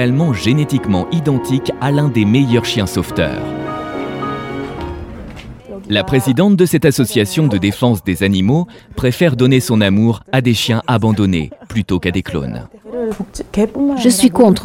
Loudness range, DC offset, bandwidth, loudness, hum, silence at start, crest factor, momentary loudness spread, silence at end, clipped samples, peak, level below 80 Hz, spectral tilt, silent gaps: 5 LU; under 0.1%; 17 kHz; -15 LUFS; none; 0 s; 14 dB; 14 LU; 0 s; under 0.1%; 0 dBFS; -38 dBFS; -6 dB/octave; none